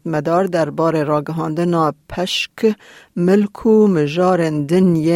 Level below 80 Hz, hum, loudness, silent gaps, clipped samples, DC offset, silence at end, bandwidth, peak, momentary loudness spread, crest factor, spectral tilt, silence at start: -50 dBFS; none; -17 LUFS; none; under 0.1%; under 0.1%; 0 s; 16 kHz; -4 dBFS; 7 LU; 12 dB; -6.5 dB/octave; 0.05 s